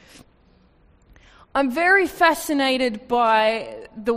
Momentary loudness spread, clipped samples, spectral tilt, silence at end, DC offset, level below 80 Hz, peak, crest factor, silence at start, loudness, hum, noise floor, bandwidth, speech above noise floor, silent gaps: 11 LU; under 0.1%; -3 dB/octave; 0 s; under 0.1%; -54 dBFS; -4 dBFS; 18 dB; 1.55 s; -20 LUFS; none; -56 dBFS; 15.5 kHz; 36 dB; none